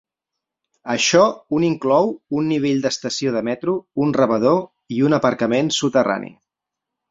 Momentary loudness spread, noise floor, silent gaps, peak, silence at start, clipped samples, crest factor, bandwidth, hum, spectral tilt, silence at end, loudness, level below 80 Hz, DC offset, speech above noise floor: 7 LU; -84 dBFS; none; -2 dBFS; 0.85 s; under 0.1%; 18 dB; 7.8 kHz; none; -4.5 dB/octave; 0.8 s; -19 LUFS; -60 dBFS; under 0.1%; 66 dB